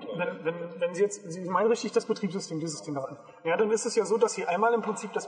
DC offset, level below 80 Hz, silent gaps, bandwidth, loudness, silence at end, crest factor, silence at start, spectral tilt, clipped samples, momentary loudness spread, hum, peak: under 0.1%; -86 dBFS; none; 10 kHz; -29 LUFS; 0 s; 18 dB; 0 s; -4.5 dB/octave; under 0.1%; 9 LU; none; -10 dBFS